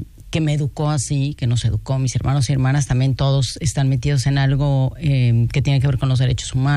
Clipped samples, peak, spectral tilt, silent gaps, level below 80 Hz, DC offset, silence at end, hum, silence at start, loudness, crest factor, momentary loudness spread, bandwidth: under 0.1%; -6 dBFS; -6 dB/octave; none; -34 dBFS; under 0.1%; 0 s; none; 0 s; -19 LUFS; 12 dB; 4 LU; 11.5 kHz